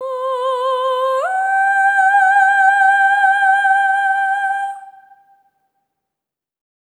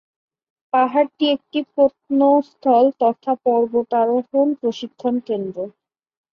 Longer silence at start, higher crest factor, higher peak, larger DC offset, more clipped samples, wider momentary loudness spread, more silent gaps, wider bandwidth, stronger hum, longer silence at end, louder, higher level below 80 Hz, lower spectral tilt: second, 0 s vs 0.75 s; about the same, 12 dB vs 16 dB; about the same, -4 dBFS vs -4 dBFS; neither; neither; about the same, 9 LU vs 9 LU; neither; first, 10.5 kHz vs 6.8 kHz; neither; first, 1.9 s vs 0.65 s; first, -14 LUFS vs -19 LUFS; second, under -90 dBFS vs -66 dBFS; second, 3 dB/octave vs -6.5 dB/octave